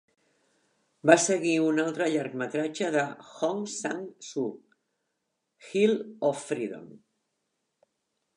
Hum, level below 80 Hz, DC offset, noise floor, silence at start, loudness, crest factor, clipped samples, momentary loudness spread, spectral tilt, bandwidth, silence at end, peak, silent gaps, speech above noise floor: none; -84 dBFS; under 0.1%; -81 dBFS; 1.05 s; -28 LUFS; 26 dB; under 0.1%; 13 LU; -4 dB/octave; 11.5 kHz; 1.4 s; -4 dBFS; none; 53 dB